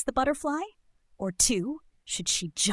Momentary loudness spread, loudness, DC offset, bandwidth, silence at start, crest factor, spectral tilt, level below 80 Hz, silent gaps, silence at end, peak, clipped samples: 13 LU; -28 LUFS; under 0.1%; 12 kHz; 0 s; 20 dB; -2.5 dB/octave; -50 dBFS; none; 0 s; -10 dBFS; under 0.1%